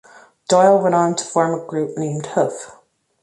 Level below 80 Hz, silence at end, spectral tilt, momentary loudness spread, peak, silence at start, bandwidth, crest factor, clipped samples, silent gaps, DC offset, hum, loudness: -66 dBFS; 0.5 s; -5 dB/octave; 16 LU; -2 dBFS; 0.5 s; 11.5 kHz; 16 dB; under 0.1%; none; under 0.1%; none; -18 LUFS